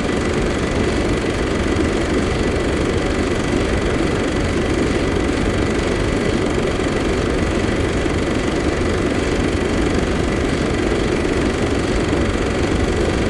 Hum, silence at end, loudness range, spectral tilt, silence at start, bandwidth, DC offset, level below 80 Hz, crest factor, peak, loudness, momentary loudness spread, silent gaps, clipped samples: none; 0 s; 0 LU; -5.5 dB/octave; 0 s; 11.5 kHz; under 0.1%; -26 dBFS; 14 dB; -4 dBFS; -19 LUFS; 1 LU; none; under 0.1%